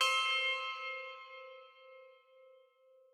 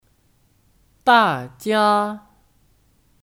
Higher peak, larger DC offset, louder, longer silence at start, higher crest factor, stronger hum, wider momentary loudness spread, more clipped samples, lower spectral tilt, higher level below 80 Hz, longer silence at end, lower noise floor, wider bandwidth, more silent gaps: second, -20 dBFS vs -2 dBFS; neither; second, -34 LUFS vs -18 LUFS; second, 0 s vs 1.05 s; about the same, 20 dB vs 20 dB; neither; first, 26 LU vs 12 LU; neither; second, 5.5 dB/octave vs -4.5 dB/octave; second, under -90 dBFS vs -62 dBFS; about the same, 1 s vs 1.1 s; first, -66 dBFS vs -60 dBFS; about the same, 18 kHz vs 17.5 kHz; neither